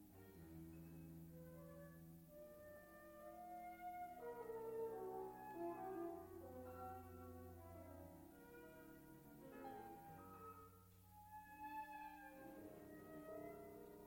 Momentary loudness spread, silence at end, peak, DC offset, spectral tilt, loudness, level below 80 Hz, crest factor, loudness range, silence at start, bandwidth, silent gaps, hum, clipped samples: 11 LU; 0 s; -40 dBFS; under 0.1%; -6.5 dB/octave; -57 LUFS; -76 dBFS; 18 dB; 8 LU; 0 s; 16.5 kHz; none; none; under 0.1%